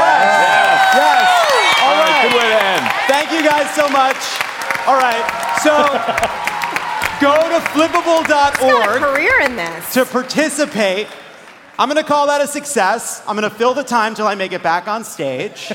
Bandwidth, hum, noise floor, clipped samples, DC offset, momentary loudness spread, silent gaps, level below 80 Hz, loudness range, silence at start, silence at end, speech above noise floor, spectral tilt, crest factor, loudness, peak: 17 kHz; none; -39 dBFS; under 0.1%; under 0.1%; 9 LU; none; -52 dBFS; 6 LU; 0 s; 0 s; 24 dB; -2.5 dB/octave; 14 dB; -14 LUFS; -2 dBFS